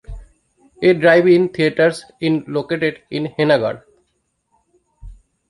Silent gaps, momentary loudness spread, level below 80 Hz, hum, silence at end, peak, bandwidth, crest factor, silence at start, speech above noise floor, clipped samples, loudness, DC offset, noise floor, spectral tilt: none; 12 LU; -44 dBFS; none; 0.35 s; -2 dBFS; 11.5 kHz; 16 dB; 0.1 s; 53 dB; under 0.1%; -16 LUFS; under 0.1%; -68 dBFS; -6.5 dB/octave